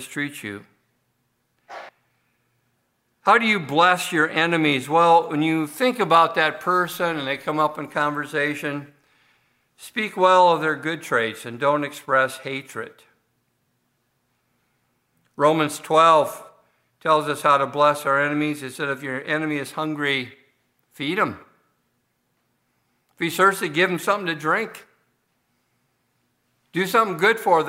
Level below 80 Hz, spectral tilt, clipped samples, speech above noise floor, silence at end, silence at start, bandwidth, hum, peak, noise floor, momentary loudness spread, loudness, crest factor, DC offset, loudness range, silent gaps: -74 dBFS; -4.5 dB/octave; under 0.1%; 50 dB; 0 s; 0 s; 16 kHz; none; -2 dBFS; -71 dBFS; 14 LU; -21 LUFS; 20 dB; under 0.1%; 9 LU; none